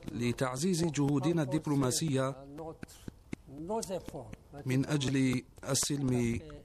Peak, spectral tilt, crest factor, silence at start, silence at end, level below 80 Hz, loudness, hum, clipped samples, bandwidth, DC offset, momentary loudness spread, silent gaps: -18 dBFS; -5 dB/octave; 16 dB; 0 s; 0 s; -56 dBFS; -32 LUFS; none; under 0.1%; 15 kHz; under 0.1%; 17 LU; none